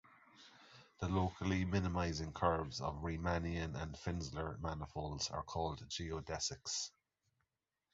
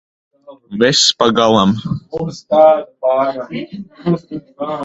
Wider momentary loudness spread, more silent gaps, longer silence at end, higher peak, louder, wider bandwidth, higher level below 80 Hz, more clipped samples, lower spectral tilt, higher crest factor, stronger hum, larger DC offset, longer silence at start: second, 8 LU vs 15 LU; neither; first, 1.05 s vs 0 s; second, -20 dBFS vs 0 dBFS; second, -41 LUFS vs -14 LUFS; about the same, 7.6 kHz vs 8.2 kHz; about the same, -52 dBFS vs -50 dBFS; neither; about the same, -5 dB/octave vs -4 dB/octave; first, 22 dB vs 16 dB; neither; neither; second, 0.35 s vs 0.5 s